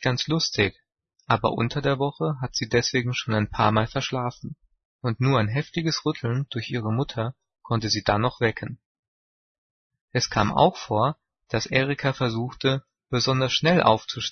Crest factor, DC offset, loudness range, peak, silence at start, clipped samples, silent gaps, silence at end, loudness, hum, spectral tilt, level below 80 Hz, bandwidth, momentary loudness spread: 22 dB; under 0.1%; 3 LU; -2 dBFS; 0 s; under 0.1%; 4.85-4.99 s, 8.85-9.90 s, 10.01-10.08 s; 0 s; -24 LUFS; none; -5 dB/octave; -50 dBFS; 6.6 kHz; 9 LU